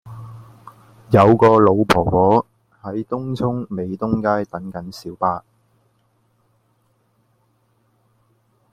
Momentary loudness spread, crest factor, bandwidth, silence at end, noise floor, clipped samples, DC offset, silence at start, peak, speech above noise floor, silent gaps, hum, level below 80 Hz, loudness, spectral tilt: 22 LU; 20 dB; 15.5 kHz; 3.35 s; -63 dBFS; under 0.1%; under 0.1%; 0.05 s; 0 dBFS; 46 dB; none; none; -48 dBFS; -18 LUFS; -7.5 dB/octave